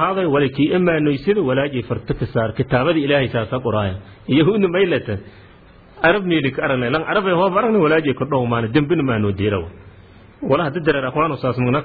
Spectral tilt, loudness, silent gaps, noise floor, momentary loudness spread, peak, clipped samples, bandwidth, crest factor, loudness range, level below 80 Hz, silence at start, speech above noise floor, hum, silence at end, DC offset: -10.5 dB/octave; -18 LUFS; none; -45 dBFS; 6 LU; -2 dBFS; under 0.1%; 4.9 kHz; 16 dB; 2 LU; -44 dBFS; 0 s; 28 dB; none; 0 s; under 0.1%